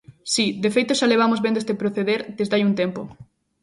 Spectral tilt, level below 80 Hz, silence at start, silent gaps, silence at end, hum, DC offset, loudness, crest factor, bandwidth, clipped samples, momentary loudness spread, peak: -4.5 dB/octave; -62 dBFS; 0.1 s; none; 0.4 s; none; under 0.1%; -21 LUFS; 16 dB; 11.5 kHz; under 0.1%; 6 LU; -6 dBFS